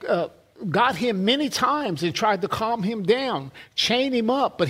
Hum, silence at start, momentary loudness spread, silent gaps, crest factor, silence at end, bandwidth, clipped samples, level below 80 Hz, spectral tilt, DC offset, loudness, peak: none; 0 s; 7 LU; none; 18 dB; 0 s; 16 kHz; under 0.1%; -60 dBFS; -4.5 dB/octave; under 0.1%; -23 LUFS; -6 dBFS